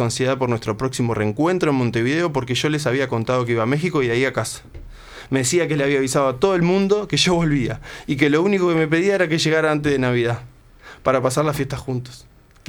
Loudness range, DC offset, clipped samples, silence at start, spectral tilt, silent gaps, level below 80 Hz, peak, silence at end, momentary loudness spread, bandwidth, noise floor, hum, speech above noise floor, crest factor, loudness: 3 LU; under 0.1%; under 0.1%; 0 s; -5 dB/octave; none; -46 dBFS; -2 dBFS; 0.5 s; 8 LU; 19.5 kHz; -44 dBFS; none; 25 dB; 18 dB; -20 LUFS